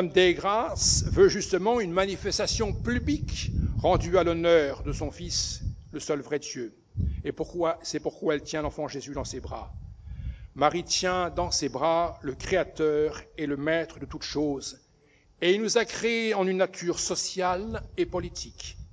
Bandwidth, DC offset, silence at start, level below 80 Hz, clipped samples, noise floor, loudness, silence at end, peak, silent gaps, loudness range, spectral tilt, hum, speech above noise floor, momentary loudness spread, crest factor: 8 kHz; under 0.1%; 0 s; -40 dBFS; under 0.1%; -61 dBFS; -27 LUFS; 0.05 s; -8 dBFS; none; 6 LU; -4 dB/octave; none; 34 dB; 14 LU; 20 dB